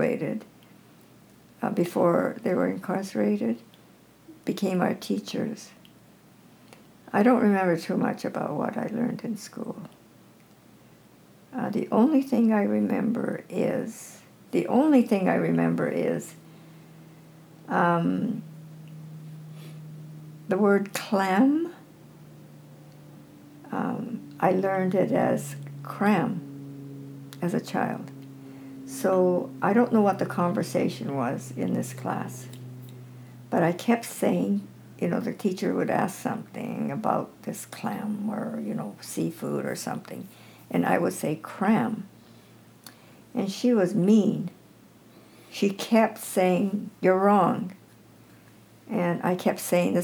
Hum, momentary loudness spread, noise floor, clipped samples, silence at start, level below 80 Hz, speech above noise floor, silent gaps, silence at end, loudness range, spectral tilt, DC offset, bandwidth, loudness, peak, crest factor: none; 20 LU; -55 dBFS; under 0.1%; 0 s; -76 dBFS; 30 dB; none; 0 s; 6 LU; -6.5 dB/octave; under 0.1%; 20 kHz; -26 LUFS; -6 dBFS; 20 dB